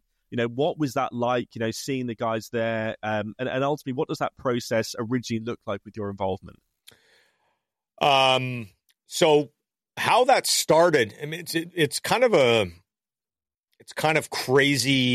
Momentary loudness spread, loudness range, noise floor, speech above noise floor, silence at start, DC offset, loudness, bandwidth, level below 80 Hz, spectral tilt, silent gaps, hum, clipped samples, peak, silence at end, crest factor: 13 LU; 8 LU; under -90 dBFS; over 66 dB; 0.3 s; under 0.1%; -24 LUFS; 15.5 kHz; -64 dBFS; -4 dB/octave; none; none; under 0.1%; -6 dBFS; 0 s; 18 dB